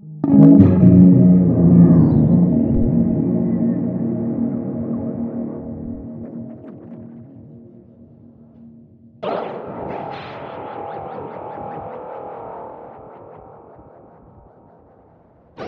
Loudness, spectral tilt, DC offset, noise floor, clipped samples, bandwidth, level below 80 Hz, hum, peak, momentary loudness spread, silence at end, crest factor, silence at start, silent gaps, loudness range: -14 LUFS; -12.5 dB/octave; under 0.1%; -51 dBFS; under 0.1%; 4.2 kHz; -40 dBFS; none; 0 dBFS; 23 LU; 0 s; 18 dB; 0.05 s; none; 23 LU